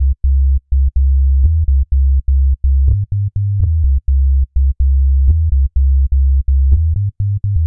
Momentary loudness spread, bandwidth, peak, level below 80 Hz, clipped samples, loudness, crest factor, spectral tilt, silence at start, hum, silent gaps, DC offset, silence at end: 4 LU; 0.5 kHz; 0 dBFS; -12 dBFS; under 0.1%; -15 LUFS; 10 dB; -15.5 dB/octave; 0 s; none; none; 1%; 0 s